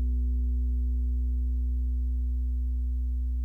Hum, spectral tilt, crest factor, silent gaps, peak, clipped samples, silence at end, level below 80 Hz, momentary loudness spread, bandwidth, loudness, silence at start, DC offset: 60 Hz at -70 dBFS; -11 dB/octave; 6 dB; none; -22 dBFS; under 0.1%; 0 s; -28 dBFS; 2 LU; 0.5 kHz; -30 LUFS; 0 s; under 0.1%